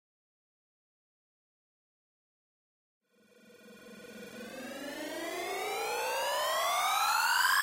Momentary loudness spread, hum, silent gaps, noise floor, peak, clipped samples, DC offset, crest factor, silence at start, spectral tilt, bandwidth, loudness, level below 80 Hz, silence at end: 21 LU; none; none; -63 dBFS; -18 dBFS; under 0.1%; under 0.1%; 18 dB; 3.5 s; 0 dB/octave; 16.5 kHz; -31 LUFS; -78 dBFS; 0 s